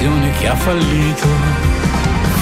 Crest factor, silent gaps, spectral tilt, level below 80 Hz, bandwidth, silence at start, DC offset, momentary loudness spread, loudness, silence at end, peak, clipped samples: 12 dB; none; -5.5 dB/octave; -20 dBFS; 16 kHz; 0 s; under 0.1%; 1 LU; -15 LUFS; 0 s; -2 dBFS; under 0.1%